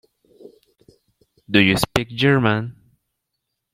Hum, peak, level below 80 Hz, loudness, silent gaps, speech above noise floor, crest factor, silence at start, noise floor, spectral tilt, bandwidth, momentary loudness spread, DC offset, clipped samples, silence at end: none; 0 dBFS; -48 dBFS; -18 LUFS; none; 61 dB; 22 dB; 1.5 s; -78 dBFS; -5.5 dB/octave; 16 kHz; 8 LU; under 0.1%; under 0.1%; 1 s